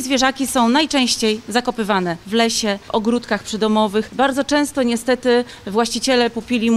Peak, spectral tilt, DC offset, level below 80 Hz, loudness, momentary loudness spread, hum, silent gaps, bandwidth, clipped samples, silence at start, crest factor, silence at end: -2 dBFS; -3.5 dB/octave; under 0.1%; -48 dBFS; -18 LUFS; 5 LU; none; none; 15.5 kHz; under 0.1%; 0 s; 16 dB; 0 s